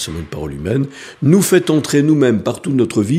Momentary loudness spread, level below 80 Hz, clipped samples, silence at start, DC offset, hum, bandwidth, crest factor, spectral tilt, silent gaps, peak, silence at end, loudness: 12 LU; -42 dBFS; under 0.1%; 0 s; under 0.1%; none; 15.5 kHz; 14 dB; -6 dB/octave; none; 0 dBFS; 0 s; -15 LUFS